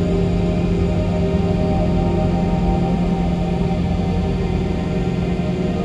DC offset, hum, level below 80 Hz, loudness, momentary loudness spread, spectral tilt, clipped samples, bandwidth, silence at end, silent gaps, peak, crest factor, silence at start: under 0.1%; none; -26 dBFS; -19 LUFS; 2 LU; -8.5 dB/octave; under 0.1%; 8 kHz; 0 s; none; -6 dBFS; 12 dB; 0 s